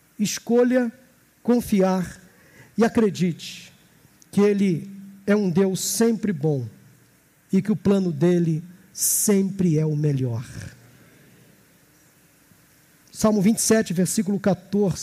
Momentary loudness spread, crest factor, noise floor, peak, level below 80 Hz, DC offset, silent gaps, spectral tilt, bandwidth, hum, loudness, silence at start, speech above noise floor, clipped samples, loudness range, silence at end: 14 LU; 16 dB; -57 dBFS; -8 dBFS; -58 dBFS; under 0.1%; none; -5.5 dB/octave; 15.5 kHz; none; -22 LUFS; 0.2 s; 37 dB; under 0.1%; 5 LU; 0 s